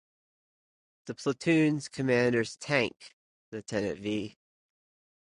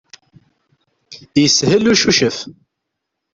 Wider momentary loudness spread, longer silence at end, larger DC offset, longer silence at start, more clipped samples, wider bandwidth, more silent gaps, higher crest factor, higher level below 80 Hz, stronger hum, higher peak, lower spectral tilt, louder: first, 18 LU vs 13 LU; first, 1 s vs 0.8 s; neither; about the same, 1.05 s vs 1.1 s; neither; first, 11 kHz vs 7.8 kHz; first, 3.13-3.52 s vs none; about the same, 20 dB vs 18 dB; second, -66 dBFS vs -52 dBFS; neither; second, -12 dBFS vs 0 dBFS; first, -5.5 dB/octave vs -3.5 dB/octave; second, -29 LUFS vs -13 LUFS